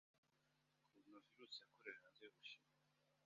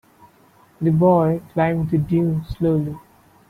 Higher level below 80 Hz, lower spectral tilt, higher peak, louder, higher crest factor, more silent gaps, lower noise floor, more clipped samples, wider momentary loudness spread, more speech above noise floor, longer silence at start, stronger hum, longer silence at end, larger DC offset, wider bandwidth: second, under -90 dBFS vs -44 dBFS; second, 0.5 dB/octave vs -10 dB/octave; second, -40 dBFS vs -4 dBFS; second, -61 LUFS vs -20 LUFS; first, 26 dB vs 16 dB; first, 0.18-0.23 s vs none; first, -84 dBFS vs -53 dBFS; neither; first, 11 LU vs 8 LU; second, 22 dB vs 35 dB; second, 0.15 s vs 0.8 s; neither; second, 0 s vs 0.5 s; neither; first, 7 kHz vs 4.6 kHz